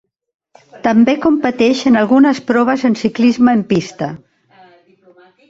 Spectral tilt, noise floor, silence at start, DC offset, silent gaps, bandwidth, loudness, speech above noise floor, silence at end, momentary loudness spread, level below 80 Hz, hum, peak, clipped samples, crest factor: -6 dB/octave; -48 dBFS; 0.75 s; under 0.1%; none; 7.8 kHz; -13 LUFS; 36 dB; 1.3 s; 8 LU; -54 dBFS; none; 0 dBFS; under 0.1%; 14 dB